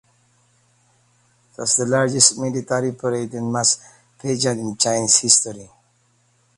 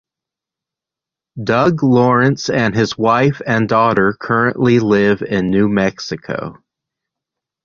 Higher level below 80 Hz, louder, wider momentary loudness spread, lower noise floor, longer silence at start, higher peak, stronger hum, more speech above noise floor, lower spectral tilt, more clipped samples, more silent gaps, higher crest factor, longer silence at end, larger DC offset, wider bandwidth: second, -62 dBFS vs -48 dBFS; second, -18 LUFS vs -15 LUFS; about the same, 12 LU vs 11 LU; second, -62 dBFS vs -86 dBFS; first, 1.6 s vs 1.35 s; about the same, 0 dBFS vs -2 dBFS; neither; second, 42 dB vs 72 dB; second, -2.5 dB/octave vs -6.5 dB/octave; neither; neither; first, 22 dB vs 14 dB; second, 0.9 s vs 1.1 s; neither; first, 14.5 kHz vs 7.4 kHz